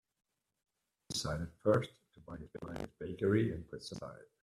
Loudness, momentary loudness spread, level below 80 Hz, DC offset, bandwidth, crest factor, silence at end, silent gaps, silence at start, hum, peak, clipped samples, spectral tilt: -37 LUFS; 17 LU; -62 dBFS; under 0.1%; 14 kHz; 22 dB; 0.2 s; none; 1.1 s; none; -16 dBFS; under 0.1%; -5.5 dB/octave